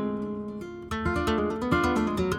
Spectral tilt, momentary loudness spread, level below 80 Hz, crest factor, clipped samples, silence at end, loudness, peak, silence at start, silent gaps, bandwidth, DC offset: -6.5 dB/octave; 11 LU; -42 dBFS; 18 dB; under 0.1%; 0 s; -28 LUFS; -10 dBFS; 0 s; none; 16.5 kHz; under 0.1%